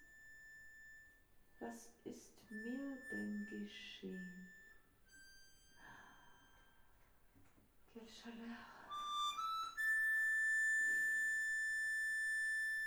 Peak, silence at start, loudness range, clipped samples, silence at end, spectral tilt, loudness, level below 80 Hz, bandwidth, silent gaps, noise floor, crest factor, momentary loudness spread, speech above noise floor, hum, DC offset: -32 dBFS; 0 s; 22 LU; under 0.1%; 0 s; -2 dB/octave; -39 LUFS; -76 dBFS; over 20 kHz; none; -69 dBFS; 12 dB; 24 LU; 19 dB; none; under 0.1%